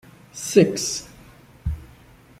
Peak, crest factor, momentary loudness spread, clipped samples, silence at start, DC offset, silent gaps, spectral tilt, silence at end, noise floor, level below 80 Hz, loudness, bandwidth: -2 dBFS; 22 dB; 21 LU; under 0.1%; 0.35 s; under 0.1%; none; -4.5 dB/octave; 0.55 s; -50 dBFS; -42 dBFS; -22 LUFS; 16 kHz